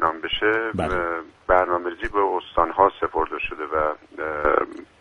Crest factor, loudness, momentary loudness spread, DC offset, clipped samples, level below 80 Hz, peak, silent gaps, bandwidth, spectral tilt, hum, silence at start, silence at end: 20 dB; -23 LUFS; 9 LU; under 0.1%; under 0.1%; -42 dBFS; -2 dBFS; none; 10.5 kHz; -6 dB/octave; none; 0 s; 0.15 s